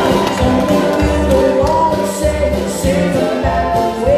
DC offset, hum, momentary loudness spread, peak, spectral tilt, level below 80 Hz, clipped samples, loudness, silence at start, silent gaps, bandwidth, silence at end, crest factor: under 0.1%; none; 3 LU; -2 dBFS; -6 dB/octave; -24 dBFS; under 0.1%; -14 LUFS; 0 s; none; 15 kHz; 0 s; 12 dB